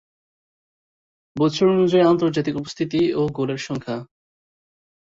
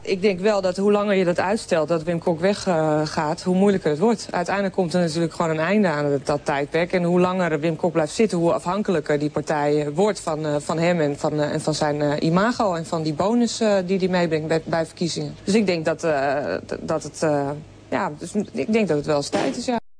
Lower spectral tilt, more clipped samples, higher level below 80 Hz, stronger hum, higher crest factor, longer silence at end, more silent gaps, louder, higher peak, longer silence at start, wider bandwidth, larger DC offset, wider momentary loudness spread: about the same, -6.5 dB/octave vs -6 dB/octave; neither; about the same, -58 dBFS vs -54 dBFS; neither; about the same, 18 dB vs 14 dB; first, 1.1 s vs 0 s; neither; about the same, -20 LUFS vs -22 LUFS; about the same, -6 dBFS vs -8 dBFS; first, 1.35 s vs 0 s; second, 7.8 kHz vs 10.5 kHz; neither; first, 12 LU vs 6 LU